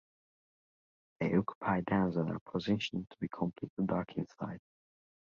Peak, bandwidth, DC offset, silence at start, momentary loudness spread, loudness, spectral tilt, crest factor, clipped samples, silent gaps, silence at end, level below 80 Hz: -16 dBFS; 7.2 kHz; under 0.1%; 1.2 s; 10 LU; -35 LUFS; -7.5 dB/octave; 20 dB; under 0.1%; 1.55-1.61 s, 2.41-2.46 s, 3.70-3.77 s; 0.6 s; -64 dBFS